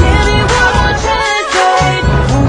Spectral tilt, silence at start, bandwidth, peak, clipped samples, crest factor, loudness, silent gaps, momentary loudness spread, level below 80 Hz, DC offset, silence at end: -4.5 dB/octave; 0 s; 10.5 kHz; 0 dBFS; 0.3%; 10 dB; -11 LUFS; none; 3 LU; -18 dBFS; under 0.1%; 0 s